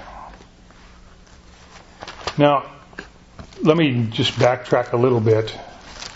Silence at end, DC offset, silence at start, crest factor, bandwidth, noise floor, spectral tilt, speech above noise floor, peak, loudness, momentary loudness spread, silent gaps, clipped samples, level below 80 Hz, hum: 0 s; under 0.1%; 0 s; 22 dB; 8 kHz; -46 dBFS; -6.5 dB/octave; 29 dB; 0 dBFS; -19 LUFS; 22 LU; none; under 0.1%; -48 dBFS; none